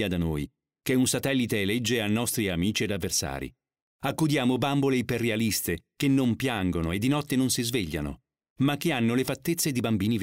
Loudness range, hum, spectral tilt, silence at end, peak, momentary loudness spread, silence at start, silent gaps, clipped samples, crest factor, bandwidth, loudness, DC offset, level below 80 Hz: 1 LU; none; -4.5 dB/octave; 0 s; -10 dBFS; 8 LU; 0 s; 3.82-3.99 s, 8.50-8.56 s; under 0.1%; 16 dB; 16 kHz; -27 LUFS; under 0.1%; -50 dBFS